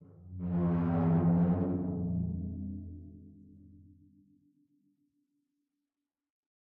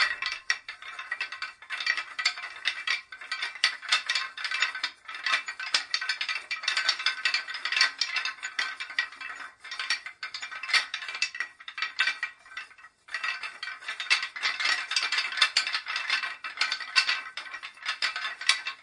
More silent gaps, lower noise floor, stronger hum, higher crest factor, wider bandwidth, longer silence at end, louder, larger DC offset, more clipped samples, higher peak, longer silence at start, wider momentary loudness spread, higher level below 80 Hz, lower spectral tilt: neither; first, under -90 dBFS vs -51 dBFS; neither; second, 16 dB vs 26 dB; second, 2.9 kHz vs 11.5 kHz; first, 2.95 s vs 0 s; second, -32 LUFS vs -28 LUFS; neither; neither; second, -18 dBFS vs -4 dBFS; about the same, 0 s vs 0 s; first, 20 LU vs 12 LU; first, -60 dBFS vs -78 dBFS; first, -11.5 dB/octave vs 3.5 dB/octave